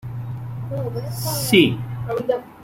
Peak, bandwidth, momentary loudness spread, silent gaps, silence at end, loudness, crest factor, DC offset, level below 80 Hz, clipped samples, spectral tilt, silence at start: -2 dBFS; 16.5 kHz; 15 LU; none; 0 s; -22 LUFS; 20 dB; under 0.1%; -48 dBFS; under 0.1%; -5 dB/octave; 0.05 s